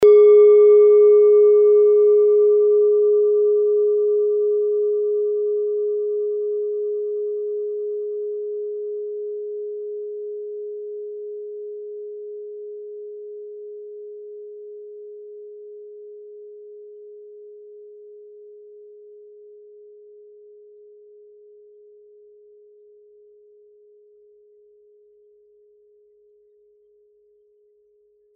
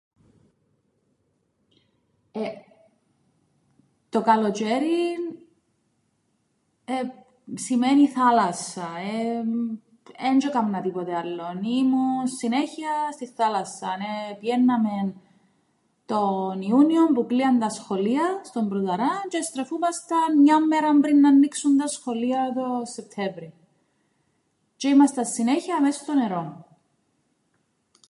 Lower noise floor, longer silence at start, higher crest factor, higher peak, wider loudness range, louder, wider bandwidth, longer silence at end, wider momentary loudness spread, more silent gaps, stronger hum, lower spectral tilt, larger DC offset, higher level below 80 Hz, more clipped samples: second, -60 dBFS vs -71 dBFS; second, 0 s vs 2.35 s; about the same, 16 dB vs 18 dB; about the same, -6 dBFS vs -6 dBFS; first, 26 LU vs 8 LU; first, -17 LUFS vs -23 LUFS; second, 2.3 kHz vs 11.5 kHz; first, 10.85 s vs 1.45 s; first, 27 LU vs 13 LU; neither; neither; second, -2.5 dB/octave vs -5 dB/octave; neither; about the same, -74 dBFS vs -78 dBFS; neither